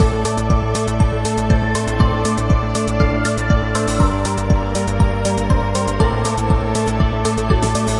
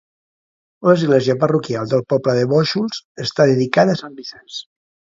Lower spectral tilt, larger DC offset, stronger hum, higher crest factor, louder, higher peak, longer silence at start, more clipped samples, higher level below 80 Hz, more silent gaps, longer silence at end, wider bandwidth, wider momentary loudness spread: about the same, -6 dB/octave vs -6.5 dB/octave; neither; neither; about the same, 14 dB vs 18 dB; about the same, -18 LUFS vs -17 LUFS; about the same, -2 dBFS vs 0 dBFS; second, 0 s vs 0.8 s; neither; first, -22 dBFS vs -60 dBFS; second, none vs 3.05-3.15 s; second, 0 s vs 0.5 s; first, 11.5 kHz vs 7.8 kHz; second, 2 LU vs 17 LU